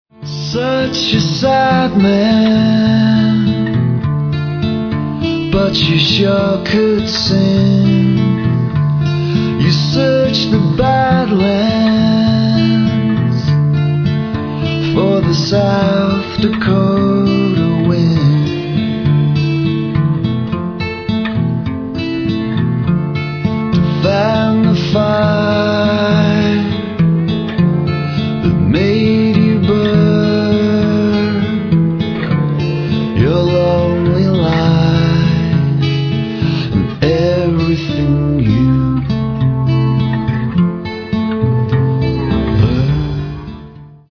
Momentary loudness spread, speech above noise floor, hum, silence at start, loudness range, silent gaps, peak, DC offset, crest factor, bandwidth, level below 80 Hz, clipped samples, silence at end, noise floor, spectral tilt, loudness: 6 LU; 23 dB; none; 0.2 s; 3 LU; none; 0 dBFS; under 0.1%; 12 dB; 5.4 kHz; -34 dBFS; under 0.1%; 0.2 s; -35 dBFS; -7.5 dB/octave; -13 LUFS